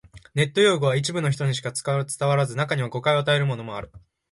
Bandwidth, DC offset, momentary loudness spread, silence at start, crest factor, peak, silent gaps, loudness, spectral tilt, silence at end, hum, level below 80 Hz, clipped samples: 11.5 kHz; under 0.1%; 9 LU; 0.15 s; 16 dB; -6 dBFS; none; -23 LUFS; -5 dB/octave; 0.35 s; none; -56 dBFS; under 0.1%